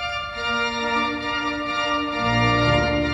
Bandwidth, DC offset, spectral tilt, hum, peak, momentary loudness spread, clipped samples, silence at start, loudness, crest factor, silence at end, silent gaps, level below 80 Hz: 10 kHz; under 0.1%; -5.5 dB/octave; none; -6 dBFS; 6 LU; under 0.1%; 0 s; -22 LUFS; 16 dB; 0 s; none; -38 dBFS